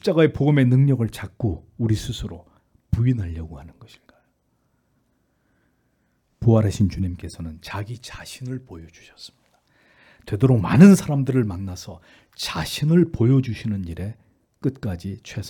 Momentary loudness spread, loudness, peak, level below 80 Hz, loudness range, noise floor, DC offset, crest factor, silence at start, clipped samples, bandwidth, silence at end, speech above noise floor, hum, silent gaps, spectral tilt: 19 LU; -21 LUFS; 0 dBFS; -46 dBFS; 11 LU; -68 dBFS; under 0.1%; 22 dB; 0.05 s; under 0.1%; 18 kHz; 0 s; 47 dB; none; none; -7.5 dB/octave